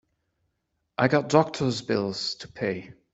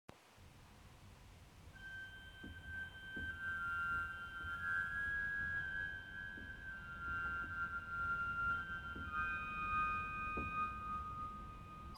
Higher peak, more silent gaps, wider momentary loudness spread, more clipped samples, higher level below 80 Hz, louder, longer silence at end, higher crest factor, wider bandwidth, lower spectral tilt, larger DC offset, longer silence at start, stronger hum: first, -4 dBFS vs -28 dBFS; neither; second, 10 LU vs 22 LU; neither; second, -64 dBFS vs -58 dBFS; first, -26 LUFS vs -42 LUFS; first, 0.2 s vs 0 s; first, 24 dB vs 16 dB; second, 8.2 kHz vs 19 kHz; about the same, -5.5 dB/octave vs -5 dB/octave; neither; first, 1 s vs 0.1 s; neither